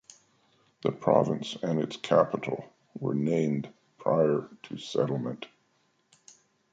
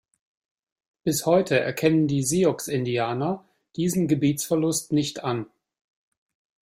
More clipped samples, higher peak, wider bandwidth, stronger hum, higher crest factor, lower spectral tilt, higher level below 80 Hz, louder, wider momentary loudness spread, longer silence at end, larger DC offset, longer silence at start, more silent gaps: neither; about the same, -8 dBFS vs -6 dBFS; second, 9 kHz vs 16 kHz; neither; about the same, 22 dB vs 18 dB; first, -7 dB/octave vs -5 dB/octave; second, -72 dBFS vs -62 dBFS; second, -29 LUFS vs -24 LUFS; first, 16 LU vs 9 LU; about the same, 1.25 s vs 1.2 s; neither; second, 0.85 s vs 1.05 s; neither